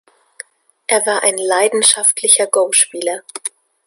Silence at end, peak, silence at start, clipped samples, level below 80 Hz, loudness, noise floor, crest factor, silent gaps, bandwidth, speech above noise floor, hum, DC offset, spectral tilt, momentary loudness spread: 0.4 s; 0 dBFS; 0.9 s; under 0.1%; -68 dBFS; -13 LUFS; -39 dBFS; 16 dB; none; 16 kHz; 24 dB; none; under 0.1%; 0.5 dB/octave; 16 LU